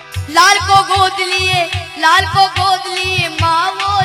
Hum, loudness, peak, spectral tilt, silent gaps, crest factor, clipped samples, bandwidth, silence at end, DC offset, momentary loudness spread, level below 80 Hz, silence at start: none; -12 LUFS; 0 dBFS; -2.5 dB/octave; none; 14 dB; 0.2%; 17.5 kHz; 0 s; under 0.1%; 6 LU; -38 dBFS; 0 s